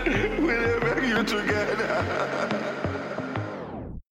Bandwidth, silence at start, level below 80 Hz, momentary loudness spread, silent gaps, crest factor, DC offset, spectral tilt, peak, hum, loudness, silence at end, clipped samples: 16.5 kHz; 0 s; -44 dBFS; 10 LU; none; 14 dB; under 0.1%; -5.5 dB/octave; -12 dBFS; none; -26 LUFS; 0.1 s; under 0.1%